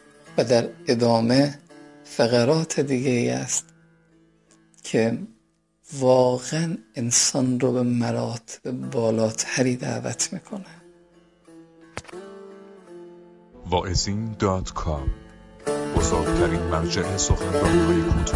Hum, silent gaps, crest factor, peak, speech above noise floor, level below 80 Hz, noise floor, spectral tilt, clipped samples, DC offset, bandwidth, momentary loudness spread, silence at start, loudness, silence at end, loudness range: none; none; 18 dB; -6 dBFS; 42 dB; -38 dBFS; -65 dBFS; -4.5 dB/octave; under 0.1%; under 0.1%; 11.5 kHz; 19 LU; 0.25 s; -23 LUFS; 0 s; 9 LU